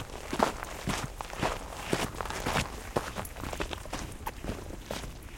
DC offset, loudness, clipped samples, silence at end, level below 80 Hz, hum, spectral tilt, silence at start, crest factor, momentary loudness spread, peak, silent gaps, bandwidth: under 0.1%; -35 LUFS; under 0.1%; 0 s; -44 dBFS; none; -4 dB/octave; 0 s; 30 dB; 9 LU; -6 dBFS; none; 17 kHz